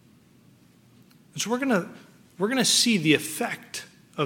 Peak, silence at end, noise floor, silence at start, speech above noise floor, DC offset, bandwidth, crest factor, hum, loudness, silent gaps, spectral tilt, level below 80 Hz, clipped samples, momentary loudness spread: -6 dBFS; 0 s; -56 dBFS; 1.35 s; 32 dB; under 0.1%; 17.5 kHz; 22 dB; none; -24 LUFS; none; -3 dB/octave; -74 dBFS; under 0.1%; 19 LU